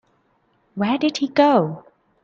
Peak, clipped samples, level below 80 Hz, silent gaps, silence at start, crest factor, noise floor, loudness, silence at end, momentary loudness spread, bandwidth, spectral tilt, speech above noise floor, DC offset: -2 dBFS; under 0.1%; -66 dBFS; none; 0.75 s; 18 dB; -64 dBFS; -19 LUFS; 0.45 s; 19 LU; 7.6 kHz; -6 dB/octave; 45 dB; under 0.1%